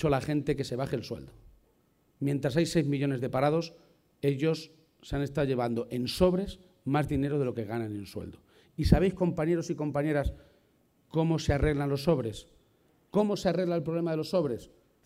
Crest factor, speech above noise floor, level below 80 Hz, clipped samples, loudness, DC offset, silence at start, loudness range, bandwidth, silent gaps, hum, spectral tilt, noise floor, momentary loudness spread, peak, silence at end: 24 dB; 40 dB; -44 dBFS; under 0.1%; -30 LUFS; under 0.1%; 0 s; 2 LU; 15.5 kHz; none; none; -7 dB/octave; -68 dBFS; 12 LU; -6 dBFS; 0.4 s